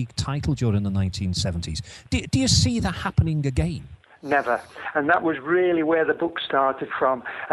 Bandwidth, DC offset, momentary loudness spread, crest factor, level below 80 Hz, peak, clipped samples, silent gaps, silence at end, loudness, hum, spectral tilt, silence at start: 12 kHz; under 0.1%; 8 LU; 18 dB; -40 dBFS; -6 dBFS; under 0.1%; none; 0 s; -23 LUFS; none; -5 dB/octave; 0 s